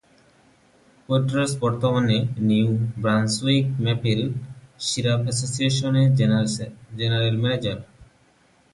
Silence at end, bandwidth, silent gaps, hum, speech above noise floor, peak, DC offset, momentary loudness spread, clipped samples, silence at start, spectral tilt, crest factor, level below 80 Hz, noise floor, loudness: 0.7 s; 11.5 kHz; none; none; 38 dB; -8 dBFS; under 0.1%; 9 LU; under 0.1%; 1.1 s; -5.5 dB/octave; 16 dB; -54 dBFS; -59 dBFS; -22 LUFS